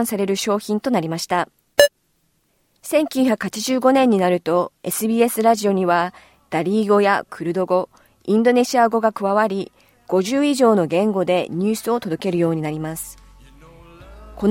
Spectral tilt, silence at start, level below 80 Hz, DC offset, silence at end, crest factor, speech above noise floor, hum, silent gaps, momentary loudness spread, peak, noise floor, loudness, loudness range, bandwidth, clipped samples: -5 dB/octave; 0 s; -54 dBFS; under 0.1%; 0 s; 18 dB; 47 dB; none; none; 9 LU; 0 dBFS; -65 dBFS; -19 LUFS; 3 LU; 17 kHz; under 0.1%